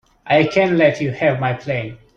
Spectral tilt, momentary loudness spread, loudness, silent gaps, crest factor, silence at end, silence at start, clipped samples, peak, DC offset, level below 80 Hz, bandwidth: -7 dB/octave; 9 LU; -17 LUFS; none; 16 dB; 0.2 s; 0.25 s; under 0.1%; -2 dBFS; under 0.1%; -54 dBFS; 7.4 kHz